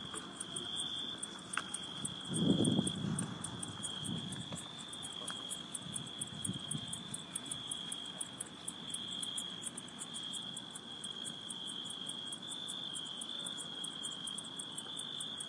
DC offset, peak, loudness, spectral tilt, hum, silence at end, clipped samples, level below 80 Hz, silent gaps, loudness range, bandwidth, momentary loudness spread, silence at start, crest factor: under 0.1%; -18 dBFS; -40 LUFS; -3 dB/octave; none; 0 s; under 0.1%; -72 dBFS; none; 4 LU; 11.5 kHz; 6 LU; 0 s; 24 dB